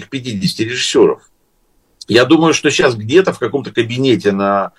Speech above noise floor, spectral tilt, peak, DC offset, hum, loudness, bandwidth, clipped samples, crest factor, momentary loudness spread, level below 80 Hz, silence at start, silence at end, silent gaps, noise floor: 44 dB; -4.5 dB/octave; 0 dBFS; under 0.1%; none; -13 LUFS; 12.5 kHz; under 0.1%; 14 dB; 8 LU; -54 dBFS; 0 s; 0.1 s; none; -58 dBFS